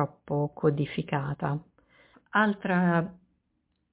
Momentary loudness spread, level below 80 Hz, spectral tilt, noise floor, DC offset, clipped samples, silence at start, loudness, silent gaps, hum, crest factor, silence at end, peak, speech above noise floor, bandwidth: 8 LU; -62 dBFS; -6 dB/octave; -76 dBFS; under 0.1%; under 0.1%; 0 s; -28 LUFS; none; none; 18 dB; 0.8 s; -10 dBFS; 48 dB; 4 kHz